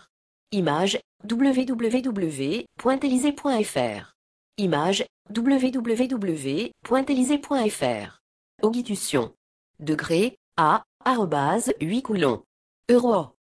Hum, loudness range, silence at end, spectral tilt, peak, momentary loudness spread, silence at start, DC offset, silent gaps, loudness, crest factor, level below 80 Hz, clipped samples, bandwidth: none; 2 LU; 0.3 s; -5 dB/octave; -6 dBFS; 8 LU; 0.5 s; under 0.1%; 1.04-1.19 s, 4.15-4.52 s, 5.09-5.25 s, 8.20-8.58 s, 9.37-9.74 s, 10.37-10.52 s, 10.86-11.00 s, 12.46-12.83 s; -24 LUFS; 18 dB; -62 dBFS; under 0.1%; 11 kHz